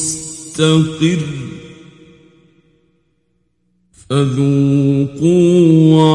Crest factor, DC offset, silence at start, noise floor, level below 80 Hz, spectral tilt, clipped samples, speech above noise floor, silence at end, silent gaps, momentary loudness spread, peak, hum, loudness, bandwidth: 14 dB; under 0.1%; 0 s; -64 dBFS; -50 dBFS; -6.5 dB/octave; under 0.1%; 52 dB; 0 s; none; 16 LU; 0 dBFS; 60 Hz at -50 dBFS; -13 LUFS; 11.5 kHz